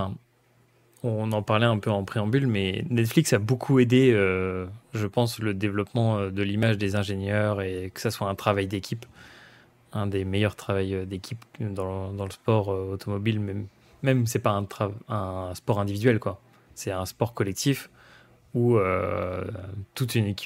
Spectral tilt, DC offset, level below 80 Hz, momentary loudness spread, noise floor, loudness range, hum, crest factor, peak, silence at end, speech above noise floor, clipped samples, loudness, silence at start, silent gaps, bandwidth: -6 dB/octave; under 0.1%; -60 dBFS; 12 LU; -63 dBFS; 6 LU; none; 20 dB; -6 dBFS; 0 s; 37 dB; under 0.1%; -26 LUFS; 0 s; none; 16 kHz